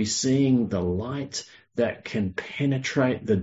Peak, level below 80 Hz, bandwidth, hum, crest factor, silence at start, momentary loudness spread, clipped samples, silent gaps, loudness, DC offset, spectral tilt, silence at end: -10 dBFS; -48 dBFS; 8 kHz; none; 16 dB; 0 s; 10 LU; under 0.1%; none; -26 LUFS; under 0.1%; -5 dB/octave; 0 s